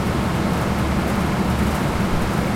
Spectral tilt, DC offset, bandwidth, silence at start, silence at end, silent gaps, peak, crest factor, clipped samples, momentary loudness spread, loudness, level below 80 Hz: -6 dB/octave; under 0.1%; 16.5 kHz; 0 s; 0 s; none; -6 dBFS; 12 dB; under 0.1%; 1 LU; -21 LUFS; -30 dBFS